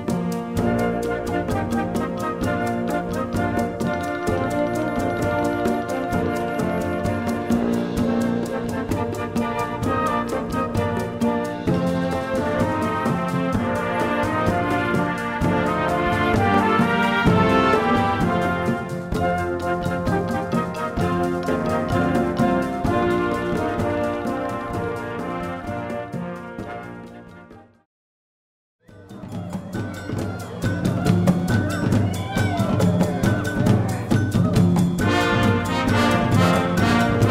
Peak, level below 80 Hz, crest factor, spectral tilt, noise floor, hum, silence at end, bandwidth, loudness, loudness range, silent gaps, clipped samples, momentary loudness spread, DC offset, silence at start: -2 dBFS; -40 dBFS; 18 dB; -6.5 dB/octave; -45 dBFS; none; 0 s; 16 kHz; -22 LUFS; 11 LU; 27.85-28.79 s; under 0.1%; 10 LU; under 0.1%; 0 s